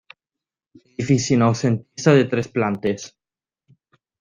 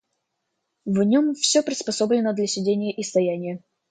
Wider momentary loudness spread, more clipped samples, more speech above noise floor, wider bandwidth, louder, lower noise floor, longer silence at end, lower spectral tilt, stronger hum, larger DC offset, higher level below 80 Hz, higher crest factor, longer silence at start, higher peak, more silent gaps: first, 14 LU vs 11 LU; neither; first, over 71 dB vs 56 dB; about the same, 9.8 kHz vs 9.4 kHz; about the same, -20 LUFS vs -22 LUFS; first, under -90 dBFS vs -78 dBFS; first, 1.15 s vs 0.35 s; first, -6 dB/octave vs -4 dB/octave; neither; neither; first, -58 dBFS vs -70 dBFS; about the same, 20 dB vs 16 dB; first, 1 s vs 0.85 s; first, -2 dBFS vs -6 dBFS; neither